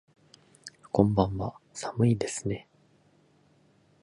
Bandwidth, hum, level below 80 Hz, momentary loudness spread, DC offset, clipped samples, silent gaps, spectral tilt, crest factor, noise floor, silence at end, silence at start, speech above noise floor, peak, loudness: 11.5 kHz; none; -52 dBFS; 21 LU; under 0.1%; under 0.1%; none; -6.5 dB/octave; 24 dB; -64 dBFS; 1.4 s; 0.65 s; 37 dB; -6 dBFS; -29 LUFS